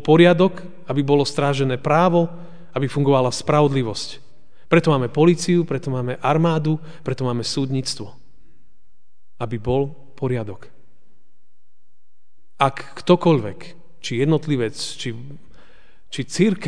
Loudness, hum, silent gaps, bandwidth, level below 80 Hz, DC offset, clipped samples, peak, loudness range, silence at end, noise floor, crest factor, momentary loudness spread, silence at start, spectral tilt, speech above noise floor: -20 LUFS; none; none; 10 kHz; -52 dBFS; 2%; under 0.1%; 0 dBFS; 9 LU; 0 s; -77 dBFS; 20 dB; 15 LU; 0 s; -6 dB/octave; 58 dB